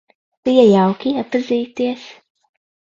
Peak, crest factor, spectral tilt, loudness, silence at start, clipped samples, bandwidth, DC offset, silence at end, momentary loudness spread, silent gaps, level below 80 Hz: 0 dBFS; 18 dB; -7 dB/octave; -16 LUFS; 0.45 s; under 0.1%; 7.6 kHz; under 0.1%; 0.8 s; 12 LU; none; -60 dBFS